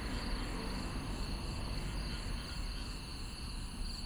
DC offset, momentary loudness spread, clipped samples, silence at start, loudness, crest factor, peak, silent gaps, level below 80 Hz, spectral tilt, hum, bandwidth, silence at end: under 0.1%; 4 LU; under 0.1%; 0 s; -42 LUFS; 12 dB; -26 dBFS; none; -42 dBFS; -4.5 dB/octave; none; over 20 kHz; 0 s